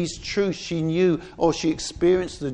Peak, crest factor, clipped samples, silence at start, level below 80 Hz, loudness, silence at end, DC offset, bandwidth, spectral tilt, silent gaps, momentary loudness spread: -6 dBFS; 16 dB; under 0.1%; 0 s; -46 dBFS; -23 LUFS; 0 s; under 0.1%; 10 kHz; -5.5 dB/octave; none; 5 LU